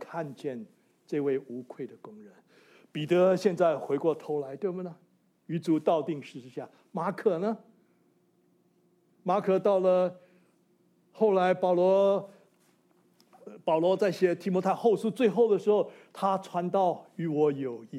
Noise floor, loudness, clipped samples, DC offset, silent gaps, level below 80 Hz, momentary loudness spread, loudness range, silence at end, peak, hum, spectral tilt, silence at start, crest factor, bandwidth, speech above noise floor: -68 dBFS; -28 LUFS; under 0.1%; under 0.1%; none; -86 dBFS; 16 LU; 5 LU; 0 s; -12 dBFS; none; -7.5 dB/octave; 0 s; 18 dB; 13.5 kHz; 40 dB